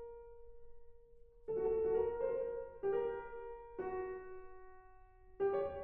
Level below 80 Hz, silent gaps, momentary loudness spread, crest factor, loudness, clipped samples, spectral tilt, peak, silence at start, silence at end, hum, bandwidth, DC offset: -62 dBFS; none; 21 LU; 16 dB; -40 LUFS; under 0.1%; -6.5 dB/octave; -26 dBFS; 0 s; 0 s; none; 3.6 kHz; under 0.1%